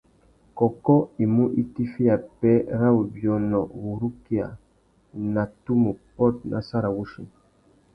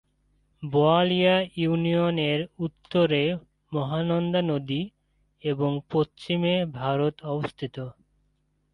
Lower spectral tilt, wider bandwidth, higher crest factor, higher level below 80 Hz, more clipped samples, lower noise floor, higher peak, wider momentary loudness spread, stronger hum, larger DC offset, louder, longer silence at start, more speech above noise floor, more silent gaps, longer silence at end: first, -11 dB/octave vs -8 dB/octave; about the same, 5.4 kHz vs 5.8 kHz; about the same, 20 dB vs 18 dB; first, -52 dBFS vs -60 dBFS; neither; second, -60 dBFS vs -70 dBFS; first, -4 dBFS vs -8 dBFS; second, 10 LU vs 13 LU; neither; neither; about the same, -24 LUFS vs -26 LUFS; about the same, 0.55 s vs 0.6 s; second, 37 dB vs 45 dB; neither; second, 0.65 s vs 0.8 s